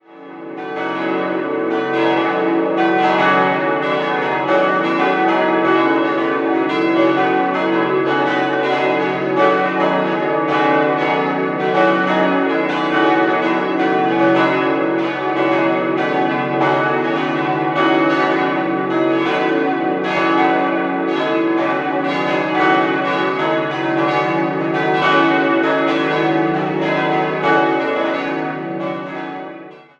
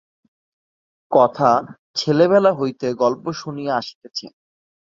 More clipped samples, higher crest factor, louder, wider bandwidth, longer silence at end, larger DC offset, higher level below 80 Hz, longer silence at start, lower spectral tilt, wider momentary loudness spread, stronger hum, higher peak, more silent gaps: neither; about the same, 16 dB vs 20 dB; first, -16 LUFS vs -19 LUFS; about the same, 7.4 kHz vs 7.6 kHz; second, 0.15 s vs 0.6 s; neither; about the same, -66 dBFS vs -64 dBFS; second, 0.1 s vs 1.1 s; about the same, -6.5 dB/octave vs -6 dB/octave; second, 5 LU vs 14 LU; neither; about the same, -2 dBFS vs 0 dBFS; second, none vs 1.79-1.94 s, 3.95-4.01 s